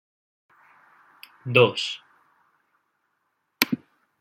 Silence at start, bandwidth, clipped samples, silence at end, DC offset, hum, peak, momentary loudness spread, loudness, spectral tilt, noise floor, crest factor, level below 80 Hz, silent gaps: 1.45 s; 16.5 kHz; under 0.1%; 0.45 s; under 0.1%; none; 0 dBFS; 18 LU; -23 LUFS; -4.5 dB/octave; -75 dBFS; 28 dB; -72 dBFS; none